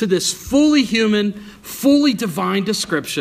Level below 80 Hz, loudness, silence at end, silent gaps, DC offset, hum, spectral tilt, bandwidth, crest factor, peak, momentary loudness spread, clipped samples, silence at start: -48 dBFS; -17 LUFS; 0 s; none; under 0.1%; none; -4 dB/octave; 15.5 kHz; 14 dB; -4 dBFS; 7 LU; under 0.1%; 0 s